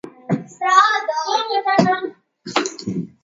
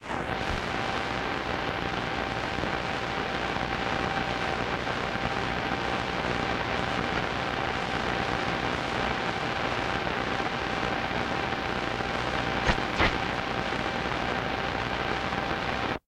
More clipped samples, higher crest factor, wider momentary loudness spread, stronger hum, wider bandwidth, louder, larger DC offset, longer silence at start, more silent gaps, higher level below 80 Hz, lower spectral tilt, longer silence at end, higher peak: neither; about the same, 20 dB vs 22 dB; first, 13 LU vs 2 LU; neither; second, 7.8 kHz vs 16 kHz; first, -19 LUFS vs -29 LUFS; neither; about the same, 0.05 s vs 0 s; neither; second, -64 dBFS vs -44 dBFS; about the same, -4 dB/octave vs -5 dB/octave; about the same, 0.15 s vs 0.1 s; first, 0 dBFS vs -8 dBFS